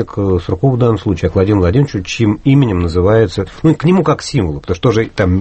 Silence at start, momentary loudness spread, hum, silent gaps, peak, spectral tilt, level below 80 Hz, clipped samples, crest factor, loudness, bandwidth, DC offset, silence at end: 0 s; 5 LU; none; none; 0 dBFS; -7.5 dB/octave; -32 dBFS; under 0.1%; 12 dB; -13 LUFS; 8.6 kHz; under 0.1%; 0 s